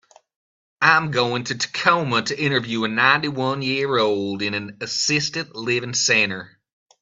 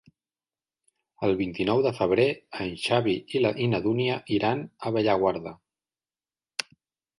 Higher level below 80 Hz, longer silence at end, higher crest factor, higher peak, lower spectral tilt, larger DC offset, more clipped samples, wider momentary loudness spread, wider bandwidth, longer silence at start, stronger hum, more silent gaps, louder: about the same, -64 dBFS vs -60 dBFS; about the same, 0.55 s vs 0.6 s; about the same, 22 dB vs 22 dB; first, 0 dBFS vs -6 dBFS; second, -3 dB/octave vs -6 dB/octave; neither; neither; second, 8 LU vs 11 LU; second, 8 kHz vs 11.5 kHz; second, 0.8 s vs 1.2 s; neither; neither; first, -20 LUFS vs -26 LUFS